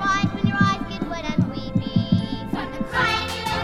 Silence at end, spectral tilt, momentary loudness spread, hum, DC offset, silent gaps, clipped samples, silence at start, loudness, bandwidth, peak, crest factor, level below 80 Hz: 0 s; -5.5 dB/octave; 7 LU; none; under 0.1%; none; under 0.1%; 0 s; -23 LUFS; 14.5 kHz; -4 dBFS; 18 dB; -40 dBFS